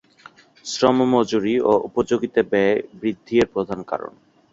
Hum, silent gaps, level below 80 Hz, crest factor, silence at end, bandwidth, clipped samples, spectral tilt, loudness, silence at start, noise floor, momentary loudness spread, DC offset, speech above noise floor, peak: none; none; -54 dBFS; 18 dB; 0.45 s; 7.8 kHz; under 0.1%; -5.5 dB/octave; -20 LUFS; 0.65 s; -49 dBFS; 11 LU; under 0.1%; 29 dB; -2 dBFS